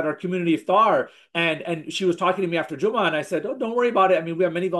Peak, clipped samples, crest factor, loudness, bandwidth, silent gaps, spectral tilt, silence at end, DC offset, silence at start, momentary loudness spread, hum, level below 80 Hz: -6 dBFS; under 0.1%; 16 dB; -22 LUFS; 12.5 kHz; none; -5.5 dB/octave; 0 s; under 0.1%; 0 s; 8 LU; none; -74 dBFS